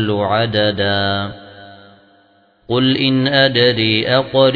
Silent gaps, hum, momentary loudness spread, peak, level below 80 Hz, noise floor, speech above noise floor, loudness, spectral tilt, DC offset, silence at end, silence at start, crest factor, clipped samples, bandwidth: none; none; 8 LU; 0 dBFS; -52 dBFS; -53 dBFS; 39 dB; -15 LUFS; -8 dB/octave; under 0.1%; 0 s; 0 s; 16 dB; under 0.1%; 5.2 kHz